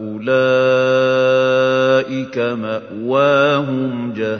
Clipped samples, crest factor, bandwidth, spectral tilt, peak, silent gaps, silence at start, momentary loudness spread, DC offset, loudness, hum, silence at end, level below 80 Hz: under 0.1%; 14 dB; 6.6 kHz; -6 dB/octave; -2 dBFS; none; 0 s; 9 LU; under 0.1%; -16 LUFS; none; 0 s; -64 dBFS